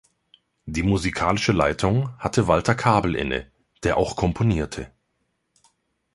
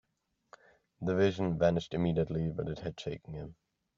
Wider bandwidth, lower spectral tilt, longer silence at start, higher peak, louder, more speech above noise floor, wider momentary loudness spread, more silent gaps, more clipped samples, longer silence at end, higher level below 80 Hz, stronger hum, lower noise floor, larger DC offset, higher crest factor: first, 11.5 kHz vs 7.4 kHz; about the same, -6 dB/octave vs -6.5 dB/octave; second, 0.65 s vs 1 s; first, -2 dBFS vs -16 dBFS; first, -22 LUFS vs -33 LUFS; first, 52 dB vs 48 dB; second, 11 LU vs 14 LU; neither; neither; first, 1.25 s vs 0.45 s; first, -40 dBFS vs -58 dBFS; neither; second, -73 dBFS vs -80 dBFS; neither; about the same, 20 dB vs 18 dB